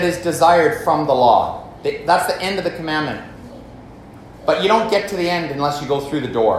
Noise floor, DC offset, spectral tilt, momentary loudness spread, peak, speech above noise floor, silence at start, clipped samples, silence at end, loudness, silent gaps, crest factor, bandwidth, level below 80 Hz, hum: -39 dBFS; under 0.1%; -4.5 dB/octave; 12 LU; 0 dBFS; 22 dB; 0 s; under 0.1%; 0 s; -18 LUFS; none; 18 dB; 15 kHz; -48 dBFS; none